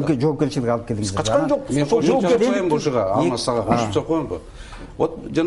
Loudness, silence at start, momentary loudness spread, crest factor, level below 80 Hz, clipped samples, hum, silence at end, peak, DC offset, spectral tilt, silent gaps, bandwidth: -20 LUFS; 0 s; 7 LU; 18 dB; -44 dBFS; under 0.1%; none; 0 s; -2 dBFS; under 0.1%; -6 dB/octave; none; 11.5 kHz